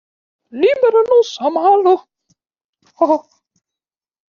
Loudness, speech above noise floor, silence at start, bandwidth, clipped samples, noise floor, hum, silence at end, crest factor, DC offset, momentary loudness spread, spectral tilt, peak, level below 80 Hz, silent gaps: -14 LUFS; 76 dB; 0.55 s; 7 kHz; under 0.1%; -89 dBFS; none; 1.15 s; 14 dB; under 0.1%; 7 LU; -1.5 dB/octave; -2 dBFS; -64 dBFS; 2.64-2.73 s